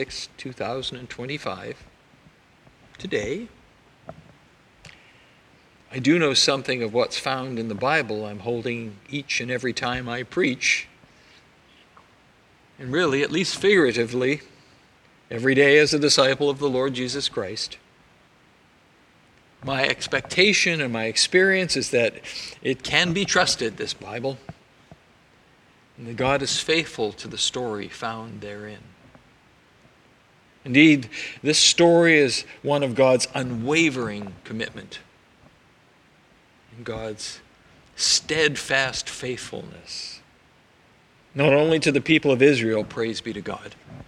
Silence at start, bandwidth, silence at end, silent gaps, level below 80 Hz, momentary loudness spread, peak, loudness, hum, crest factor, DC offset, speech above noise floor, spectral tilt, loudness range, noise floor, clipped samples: 0 s; 13.5 kHz; 0.05 s; none; -58 dBFS; 19 LU; 0 dBFS; -22 LUFS; none; 24 dB; under 0.1%; 34 dB; -3.5 dB/octave; 13 LU; -57 dBFS; under 0.1%